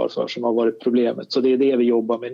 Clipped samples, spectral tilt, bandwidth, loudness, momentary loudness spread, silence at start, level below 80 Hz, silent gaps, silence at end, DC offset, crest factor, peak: under 0.1%; -6.5 dB/octave; 7.2 kHz; -20 LUFS; 5 LU; 0 s; -82 dBFS; none; 0 s; under 0.1%; 12 dB; -8 dBFS